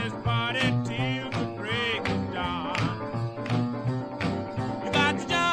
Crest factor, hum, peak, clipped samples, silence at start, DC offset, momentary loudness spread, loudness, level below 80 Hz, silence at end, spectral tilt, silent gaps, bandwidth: 18 dB; none; -10 dBFS; under 0.1%; 0 s; under 0.1%; 7 LU; -28 LUFS; -50 dBFS; 0 s; -5.5 dB/octave; none; 10.5 kHz